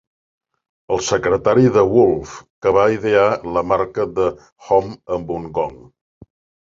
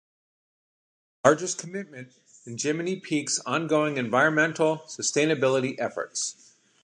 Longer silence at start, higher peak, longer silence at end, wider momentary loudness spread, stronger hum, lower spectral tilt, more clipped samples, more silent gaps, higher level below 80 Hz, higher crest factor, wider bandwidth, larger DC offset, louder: second, 0.9 s vs 1.25 s; about the same, -2 dBFS vs -2 dBFS; first, 0.9 s vs 0.5 s; about the same, 11 LU vs 11 LU; neither; first, -6 dB/octave vs -3.5 dB/octave; neither; first, 2.50-2.61 s, 4.52-4.56 s vs none; first, -46 dBFS vs -74 dBFS; second, 16 dB vs 24 dB; second, 7.6 kHz vs 11.5 kHz; neither; first, -17 LUFS vs -25 LUFS